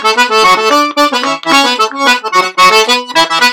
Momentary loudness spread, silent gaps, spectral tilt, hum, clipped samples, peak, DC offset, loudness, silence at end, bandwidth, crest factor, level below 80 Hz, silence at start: 4 LU; none; -1 dB/octave; none; 0.3%; 0 dBFS; under 0.1%; -8 LUFS; 0 s; over 20 kHz; 10 dB; -48 dBFS; 0 s